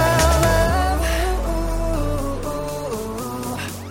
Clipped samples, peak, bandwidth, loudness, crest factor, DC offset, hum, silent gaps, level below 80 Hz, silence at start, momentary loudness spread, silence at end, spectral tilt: under 0.1%; -4 dBFS; 17 kHz; -21 LUFS; 16 dB; under 0.1%; none; none; -24 dBFS; 0 s; 11 LU; 0 s; -5 dB/octave